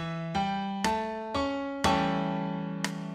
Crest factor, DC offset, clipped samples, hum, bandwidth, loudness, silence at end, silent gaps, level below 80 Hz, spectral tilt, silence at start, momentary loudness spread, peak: 18 dB; under 0.1%; under 0.1%; none; 15 kHz; -30 LUFS; 0 s; none; -54 dBFS; -5 dB/octave; 0 s; 6 LU; -12 dBFS